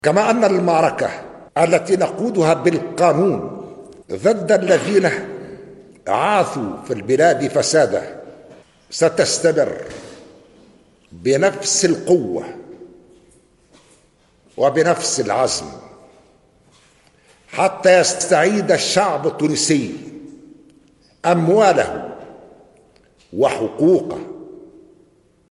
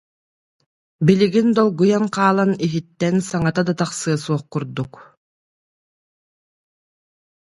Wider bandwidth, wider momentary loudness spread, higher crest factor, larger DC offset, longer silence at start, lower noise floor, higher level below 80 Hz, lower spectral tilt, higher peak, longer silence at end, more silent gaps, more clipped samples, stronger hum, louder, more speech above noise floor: about the same, 11.5 kHz vs 11.5 kHz; first, 19 LU vs 10 LU; about the same, 18 dB vs 20 dB; neither; second, 0.05 s vs 1 s; second, -56 dBFS vs under -90 dBFS; about the same, -58 dBFS vs -56 dBFS; second, -4 dB/octave vs -6.5 dB/octave; about the same, -2 dBFS vs 0 dBFS; second, 0.85 s vs 2.45 s; neither; neither; neither; about the same, -17 LUFS vs -19 LUFS; second, 39 dB vs over 72 dB